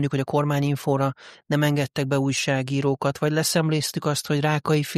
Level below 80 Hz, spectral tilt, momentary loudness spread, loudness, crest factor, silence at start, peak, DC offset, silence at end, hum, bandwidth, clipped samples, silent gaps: -60 dBFS; -5 dB/octave; 3 LU; -23 LUFS; 14 dB; 0 s; -8 dBFS; under 0.1%; 0 s; none; 15 kHz; under 0.1%; none